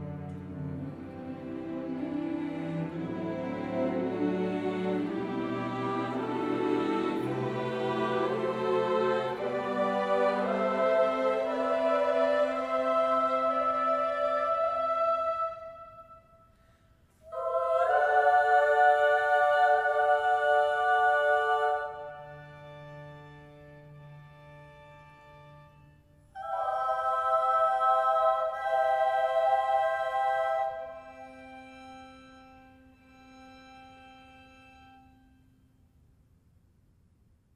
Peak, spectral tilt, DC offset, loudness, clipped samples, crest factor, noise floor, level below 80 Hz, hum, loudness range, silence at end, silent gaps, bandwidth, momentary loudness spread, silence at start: -12 dBFS; -6.5 dB/octave; under 0.1%; -28 LUFS; under 0.1%; 18 dB; -65 dBFS; -66 dBFS; none; 11 LU; 3.35 s; none; 11 kHz; 18 LU; 0 s